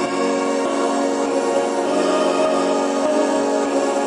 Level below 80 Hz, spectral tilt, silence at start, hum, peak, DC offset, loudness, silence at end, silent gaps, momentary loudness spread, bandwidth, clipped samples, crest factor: -68 dBFS; -3.5 dB/octave; 0 s; none; -6 dBFS; under 0.1%; -19 LUFS; 0 s; none; 2 LU; 11.5 kHz; under 0.1%; 12 dB